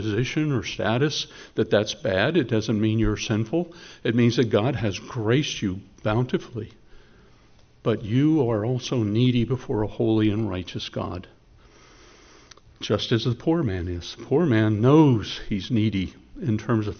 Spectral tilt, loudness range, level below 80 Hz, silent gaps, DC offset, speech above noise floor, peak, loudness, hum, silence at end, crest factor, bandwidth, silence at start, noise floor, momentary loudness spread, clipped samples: -6 dB/octave; 6 LU; -46 dBFS; none; under 0.1%; 31 dB; -6 dBFS; -24 LUFS; none; 0 s; 18 dB; 6.6 kHz; 0 s; -54 dBFS; 10 LU; under 0.1%